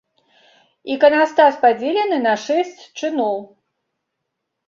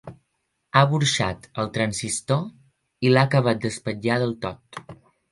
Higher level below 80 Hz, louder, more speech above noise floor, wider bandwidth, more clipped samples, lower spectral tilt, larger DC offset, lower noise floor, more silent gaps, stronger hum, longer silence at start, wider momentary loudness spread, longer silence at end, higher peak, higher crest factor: second, -70 dBFS vs -54 dBFS; first, -17 LUFS vs -23 LUFS; first, 61 dB vs 52 dB; second, 7.4 kHz vs 11.5 kHz; neither; second, -3.5 dB/octave vs -5 dB/octave; neither; about the same, -77 dBFS vs -75 dBFS; neither; neither; first, 0.85 s vs 0.05 s; about the same, 14 LU vs 15 LU; first, 1.25 s vs 0.4 s; about the same, -2 dBFS vs 0 dBFS; second, 18 dB vs 24 dB